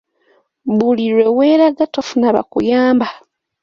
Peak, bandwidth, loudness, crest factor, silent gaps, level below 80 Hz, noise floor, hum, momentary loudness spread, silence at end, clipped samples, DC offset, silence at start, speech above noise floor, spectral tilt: -2 dBFS; 7.2 kHz; -14 LUFS; 14 dB; none; -56 dBFS; -57 dBFS; none; 8 LU; 0.45 s; under 0.1%; under 0.1%; 0.65 s; 44 dB; -6 dB/octave